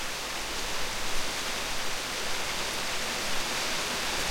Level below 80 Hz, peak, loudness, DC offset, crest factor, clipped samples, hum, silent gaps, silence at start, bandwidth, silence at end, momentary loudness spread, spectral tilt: -44 dBFS; -14 dBFS; -30 LUFS; under 0.1%; 16 dB; under 0.1%; none; none; 0 s; 16.5 kHz; 0 s; 3 LU; -1 dB/octave